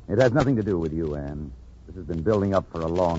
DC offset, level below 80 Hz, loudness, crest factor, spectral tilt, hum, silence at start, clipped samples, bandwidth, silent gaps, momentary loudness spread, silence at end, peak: under 0.1%; -42 dBFS; -24 LUFS; 18 dB; -8 dB/octave; none; 0 s; under 0.1%; 8 kHz; none; 18 LU; 0 s; -6 dBFS